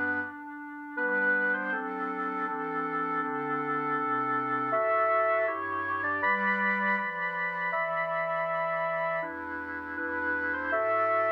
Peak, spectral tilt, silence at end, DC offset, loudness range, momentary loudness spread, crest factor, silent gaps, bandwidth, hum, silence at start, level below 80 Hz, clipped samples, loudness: -16 dBFS; -7.5 dB/octave; 0 s; under 0.1%; 3 LU; 8 LU; 14 dB; none; 6 kHz; 50 Hz at -75 dBFS; 0 s; -68 dBFS; under 0.1%; -29 LUFS